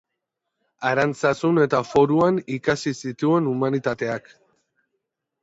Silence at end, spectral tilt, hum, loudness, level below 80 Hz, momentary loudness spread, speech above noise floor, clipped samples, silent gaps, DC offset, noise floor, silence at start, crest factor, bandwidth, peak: 1.25 s; -6.5 dB/octave; none; -22 LUFS; -60 dBFS; 9 LU; 60 dB; under 0.1%; none; under 0.1%; -81 dBFS; 0.8 s; 18 dB; 8 kHz; -6 dBFS